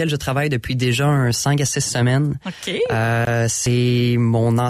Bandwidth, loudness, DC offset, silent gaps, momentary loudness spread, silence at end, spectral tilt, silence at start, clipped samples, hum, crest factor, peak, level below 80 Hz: 15 kHz; -19 LUFS; under 0.1%; none; 4 LU; 0 s; -5 dB/octave; 0 s; under 0.1%; none; 10 dB; -8 dBFS; -44 dBFS